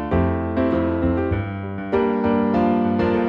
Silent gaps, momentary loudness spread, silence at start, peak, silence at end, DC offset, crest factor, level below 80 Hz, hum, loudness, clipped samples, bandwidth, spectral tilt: none; 6 LU; 0 s; -8 dBFS; 0 s; under 0.1%; 12 dB; -36 dBFS; none; -21 LUFS; under 0.1%; 5.6 kHz; -10 dB/octave